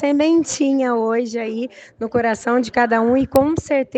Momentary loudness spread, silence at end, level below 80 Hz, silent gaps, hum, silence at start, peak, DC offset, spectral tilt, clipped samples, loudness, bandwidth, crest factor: 9 LU; 0 s; -48 dBFS; none; none; 0 s; 0 dBFS; under 0.1%; -5 dB/octave; under 0.1%; -18 LUFS; 9.6 kHz; 18 dB